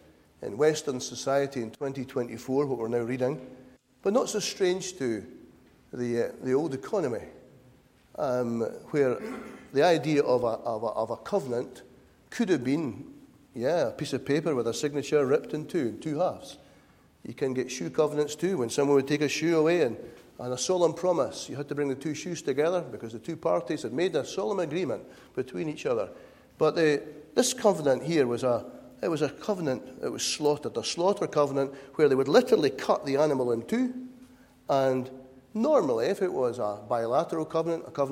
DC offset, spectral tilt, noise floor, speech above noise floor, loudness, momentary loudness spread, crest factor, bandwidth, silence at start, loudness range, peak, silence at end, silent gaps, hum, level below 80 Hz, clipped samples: under 0.1%; -5 dB/octave; -59 dBFS; 31 dB; -28 LUFS; 12 LU; 22 dB; 16 kHz; 0.4 s; 5 LU; -8 dBFS; 0 s; none; none; -66 dBFS; under 0.1%